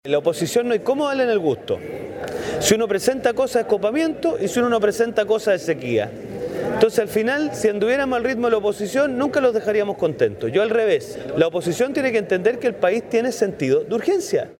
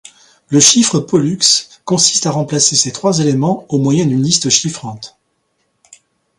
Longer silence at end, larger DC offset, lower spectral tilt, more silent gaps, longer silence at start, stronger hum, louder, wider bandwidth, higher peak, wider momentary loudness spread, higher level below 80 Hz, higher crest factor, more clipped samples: second, 0.05 s vs 1.3 s; neither; about the same, -4.5 dB/octave vs -3.5 dB/octave; neither; second, 0.05 s vs 0.5 s; neither; second, -20 LUFS vs -12 LUFS; about the same, 17 kHz vs 16 kHz; about the same, -2 dBFS vs 0 dBFS; second, 5 LU vs 8 LU; about the same, -54 dBFS vs -54 dBFS; about the same, 18 dB vs 14 dB; neither